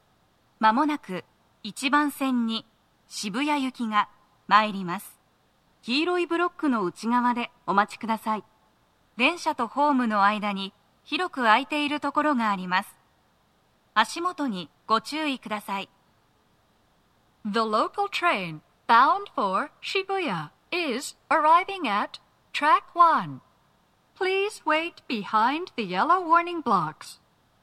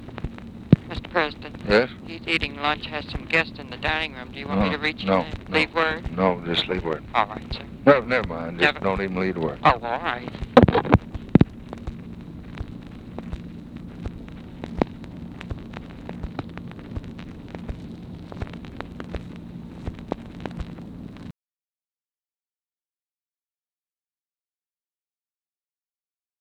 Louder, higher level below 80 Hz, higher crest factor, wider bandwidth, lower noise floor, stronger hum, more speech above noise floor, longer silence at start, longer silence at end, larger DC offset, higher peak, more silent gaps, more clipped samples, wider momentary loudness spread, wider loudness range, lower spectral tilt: about the same, -25 LUFS vs -23 LUFS; second, -74 dBFS vs -40 dBFS; about the same, 22 dB vs 26 dB; first, 14 kHz vs 10.5 kHz; second, -65 dBFS vs under -90 dBFS; neither; second, 40 dB vs over 66 dB; first, 0.6 s vs 0 s; second, 0.5 s vs 5.1 s; neither; second, -4 dBFS vs 0 dBFS; neither; neither; second, 13 LU vs 19 LU; second, 5 LU vs 16 LU; second, -4 dB/octave vs -7 dB/octave